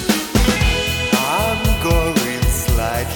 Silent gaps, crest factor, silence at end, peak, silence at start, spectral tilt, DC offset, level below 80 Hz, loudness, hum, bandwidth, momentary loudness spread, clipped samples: none; 16 dB; 0 s; -2 dBFS; 0 s; -4 dB/octave; under 0.1%; -22 dBFS; -17 LUFS; none; over 20 kHz; 3 LU; under 0.1%